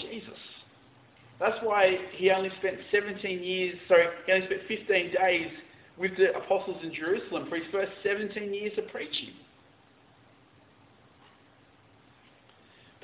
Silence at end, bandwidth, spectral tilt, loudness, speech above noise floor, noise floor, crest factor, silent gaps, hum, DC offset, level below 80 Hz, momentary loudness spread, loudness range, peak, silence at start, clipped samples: 3.7 s; 4 kHz; -2 dB/octave; -28 LUFS; 32 dB; -60 dBFS; 22 dB; none; none; under 0.1%; -70 dBFS; 13 LU; 11 LU; -8 dBFS; 0 s; under 0.1%